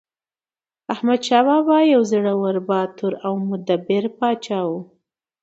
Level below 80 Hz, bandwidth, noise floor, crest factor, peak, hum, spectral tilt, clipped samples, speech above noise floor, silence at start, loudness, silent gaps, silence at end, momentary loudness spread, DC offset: -72 dBFS; 8.2 kHz; under -90 dBFS; 18 dB; -2 dBFS; none; -6 dB/octave; under 0.1%; over 71 dB; 0.9 s; -19 LUFS; none; 0.6 s; 10 LU; under 0.1%